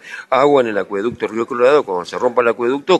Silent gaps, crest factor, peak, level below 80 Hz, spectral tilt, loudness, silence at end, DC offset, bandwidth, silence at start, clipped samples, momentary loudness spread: none; 16 dB; 0 dBFS; -60 dBFS; -5.5 dB/octave; -16 LUFS; 0 s; under 0.1%; 11.5 kHz; 0.05 s; under 0.1%; 8 LU